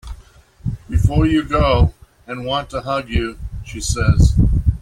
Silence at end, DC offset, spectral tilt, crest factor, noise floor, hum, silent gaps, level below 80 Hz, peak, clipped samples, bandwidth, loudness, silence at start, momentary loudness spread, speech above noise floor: 0 s; under 0.1%; -6 dB/octave; 16 dB; -45 dBFS; none; none; -22 dBFS; -2 dBFS; under 0.1%; 13 kHz; -18 LUFS; 0.05 s; 15 LU; 29 dB